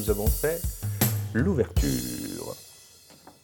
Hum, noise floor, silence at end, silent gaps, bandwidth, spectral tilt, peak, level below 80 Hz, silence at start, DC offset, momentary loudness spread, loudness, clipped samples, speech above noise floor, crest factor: none; -52 dBFS; 0.15 s; none; 19 kHz; -5.5 dB/octave; -8 dBFS; -34 dBFS; 0 s; under 0.1%; 13 LU; -27 LUFS; under 0.1%; 27 dB; 20 dB